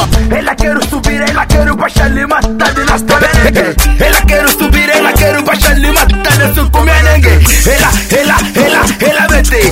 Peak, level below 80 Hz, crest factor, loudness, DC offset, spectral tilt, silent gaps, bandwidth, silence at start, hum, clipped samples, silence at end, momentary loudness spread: 0 dBFS; -12 dBFS; 8 dB; -8 LUFS; under 0.1%; -4 dB/octave; none; 16.5 kHz; 0 s; none; 0.7%; 0 s; 5 LU